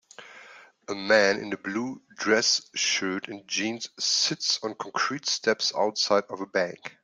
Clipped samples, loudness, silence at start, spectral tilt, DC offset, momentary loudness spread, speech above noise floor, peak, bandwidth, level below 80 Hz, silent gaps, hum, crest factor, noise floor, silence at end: under 0.1%; -26 LUFS; 0.2 s; -1.5 dB/octave; under 0.1%; 12 LU; 24 dB; -8 dBFS; 12 kHz; -74 dBFS; none; none; 20 dB; -51 dBFS; 0.15 s